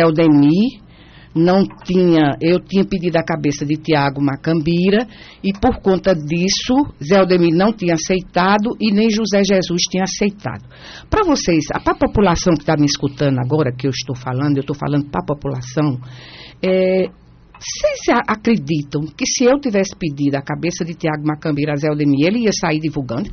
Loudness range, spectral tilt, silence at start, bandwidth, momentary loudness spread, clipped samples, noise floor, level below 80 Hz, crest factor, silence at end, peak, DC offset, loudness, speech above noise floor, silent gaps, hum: 4 LU; -5.5 dB/octave; 0 s; 6.8 kHz; 9 LU; under 0.1%; -42 dBFS; -40 dBFS; 14 dB; 0 s; -2 dBFS; under 0.1%; -17 LUFS; 26 dB; none; none